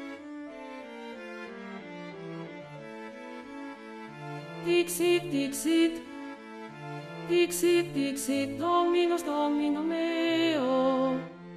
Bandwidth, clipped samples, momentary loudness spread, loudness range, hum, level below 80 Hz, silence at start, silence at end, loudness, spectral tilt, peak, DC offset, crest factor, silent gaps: 14 kHz; under 0.1%; 17 LU; 14 LU; none; -68 dBFS; 0 s; 0 s; -28 LUFS; -4 dB/octave; -14 dBFS; under 0.1%; 16 dB; none